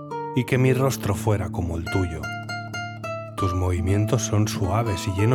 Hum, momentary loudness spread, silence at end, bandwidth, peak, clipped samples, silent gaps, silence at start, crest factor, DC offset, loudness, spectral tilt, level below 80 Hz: none; 11 LU; 0 s; 17.5 kHz; -6 dBFS; under 0.1%; none; 0 s; 16 dB; under 0.1%; -24 LUFS; -6 dB/octave; -48 dBFS